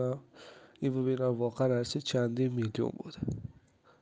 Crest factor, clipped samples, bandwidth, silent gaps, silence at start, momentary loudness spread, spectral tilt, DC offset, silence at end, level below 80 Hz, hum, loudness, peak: 16 dB; under 0.1%; 9.6 kHz; none; 0 s; 17 LU; -6.5 dB/octave; under 0.1%; 0.5 s; -62 dBFS; none; -33 LUFS; -16 dBFS